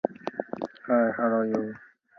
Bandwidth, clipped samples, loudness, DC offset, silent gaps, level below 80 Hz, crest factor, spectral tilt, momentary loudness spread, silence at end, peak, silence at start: 6.2 kHz; under 0.1%; -28 LUFS; under 0.1%; none; -74 dBFS; 20 dB; -8 dB/octave; 12 LU; 0.35 s; -8 dBFS; 0.05 s